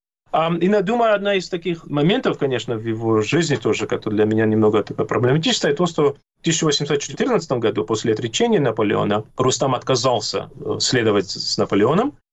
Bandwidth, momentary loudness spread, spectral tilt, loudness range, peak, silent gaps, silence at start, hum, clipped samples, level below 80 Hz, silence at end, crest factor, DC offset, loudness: 8.6 kHz; 5 LU; -4.5 dB/octave; 1 LU; -8 dBFS; none; 0.35 s; none; under 0.1%; -52 dBFS; 0.2 s; 12 dB; under 0.1%; -19 LUFS